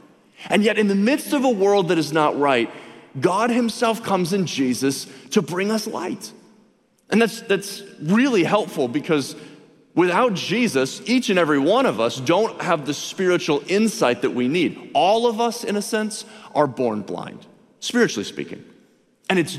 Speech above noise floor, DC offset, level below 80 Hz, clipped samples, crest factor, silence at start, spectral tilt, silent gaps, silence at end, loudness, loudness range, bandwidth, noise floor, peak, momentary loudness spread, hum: 38 dB; under 0.1%; -68 dBFS; under 0.1%; 18 dB; 0.4 s; -4.5 dB/octave; none; 0 s; -21 LUFS; 4 LU; 15.5 kHz; -59 dBFS; -2 dBFS; 13 LU; none